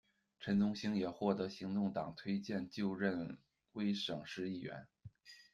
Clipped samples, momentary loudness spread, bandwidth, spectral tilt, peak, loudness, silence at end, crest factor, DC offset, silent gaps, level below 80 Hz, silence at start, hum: under 0.1%; 17 LU; 7.4 kHz; -6.5 dB/octave; -20 dBFS; -40 LUFS; 0.1 s; 20 dB; under 0.1%; none; -76 dBFS; 0.4 s; none